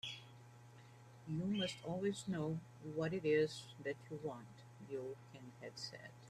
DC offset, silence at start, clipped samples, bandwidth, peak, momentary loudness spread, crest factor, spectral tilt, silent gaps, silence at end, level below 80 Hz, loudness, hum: under 0.1%; 0.05 s; under 0.1%; 13.5 kHz; -24 dBFS; 23 LU; 20 dB; -5.5 dB/octave; none; 0 s; -76 dBFS; -43 LUFS; none